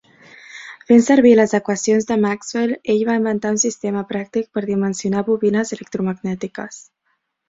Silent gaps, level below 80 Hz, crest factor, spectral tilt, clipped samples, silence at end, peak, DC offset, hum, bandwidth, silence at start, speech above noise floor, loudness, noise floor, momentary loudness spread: none; -60 dBFS; 16 dB; -5 dB/octave; under 0.1%; 0.65 s; -2 dBFS; under 0.1%; none; 7.8 kHz; 0.5 s; 52 dB; -18 LUFS; -69 dBFS; 16 LU